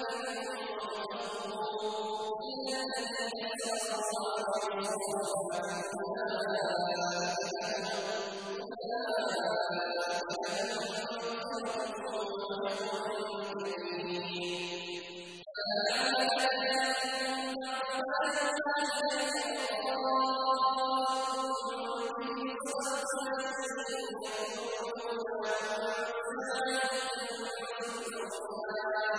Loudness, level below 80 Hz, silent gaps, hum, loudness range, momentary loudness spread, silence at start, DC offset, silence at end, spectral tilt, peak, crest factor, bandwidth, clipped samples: -34 LUFS; -76 dBFS; none; none; 5 LU; 8 LU; 0 s; under 0.1%; 0 s; -2 dB/octave; -18 dBFS; 18 dB; 11 kHz; under 0.1%